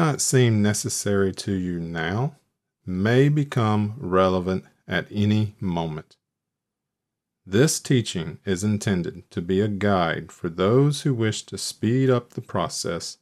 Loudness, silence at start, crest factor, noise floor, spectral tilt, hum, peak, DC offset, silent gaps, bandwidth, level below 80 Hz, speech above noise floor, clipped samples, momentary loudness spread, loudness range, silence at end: -23 LUFS; 0 s; 18 dB; -84 dBFS; -5.5 dB/octave; none; -6 dBFS; under 0.1%; none; 14.5 kHz; -56 dBFS; 61 dB; under 0.1%; 11 LU; 3 LU; 0.1 s